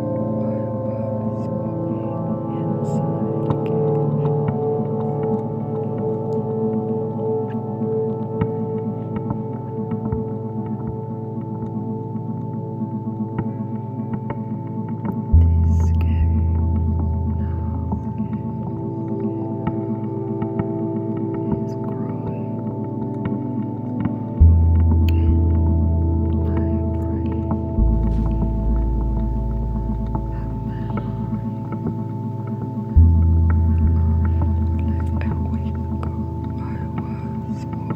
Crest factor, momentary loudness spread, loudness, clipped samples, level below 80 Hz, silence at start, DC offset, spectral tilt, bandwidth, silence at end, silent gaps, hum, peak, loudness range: 20 dB; 10 LU; -22 LUFS; under 0.1%; -26 dBFS; 0 s; under 0.1%; -11 dB/octave; 3.3 kHz; 0 s; none; none; 0 dBFS; 8 LU